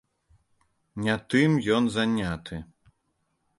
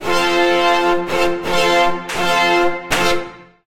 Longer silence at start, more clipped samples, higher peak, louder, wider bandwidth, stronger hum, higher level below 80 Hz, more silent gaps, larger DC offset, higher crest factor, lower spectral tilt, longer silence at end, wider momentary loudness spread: first, 0.95 s vs 0 s; neither; second, -8 dBFS vs -2 dBFS; second, -25 LUFS vs -16 LUFS; second, 11.5 kHz vs 16.5 kHz; neither; second, -54 dBFS vs -40 dBFS; neither; neither; first, 20 dB vs 14 dB; first, -6 dB/octave vs -3 dB/octave; first, 0.95 s vs 0.25 s; first, 17 LU vs 5 LU